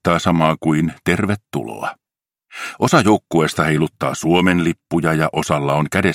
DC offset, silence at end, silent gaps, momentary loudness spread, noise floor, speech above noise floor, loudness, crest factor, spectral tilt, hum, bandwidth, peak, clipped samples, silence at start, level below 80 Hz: under 0.1%; 0 s; none; 12 LU; -64 dBFS; 47 dB; -17 LUFS; 18 dB; -5.5 dB/octave; none; 16 kHz; 0 dBFS; under 0.1%; 0.05 s; -46 dBFS